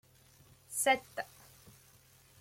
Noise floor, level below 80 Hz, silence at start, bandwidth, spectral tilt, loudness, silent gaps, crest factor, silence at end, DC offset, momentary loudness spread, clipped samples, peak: -63 dBFS; -74 dBFS; 0.7 s; 16.5 kHz; -1 dB/octave; -33 LUFS; none; 24 dB; 1.15 s; under 0.1%; 27 LU; under 0.1%; -16 dBFS